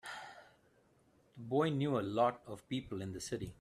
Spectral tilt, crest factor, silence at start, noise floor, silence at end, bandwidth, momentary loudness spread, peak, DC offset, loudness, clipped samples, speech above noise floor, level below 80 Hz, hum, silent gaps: -6 dB/octave; 20 dB; 0.05 s; -70 dBFS; 0.1 s; 13.5 kHz; 16 LU; -20 dBFS; under 0.1%; -37 LUFS; under 0.1%; 34 dB; -68 dBFS; none; none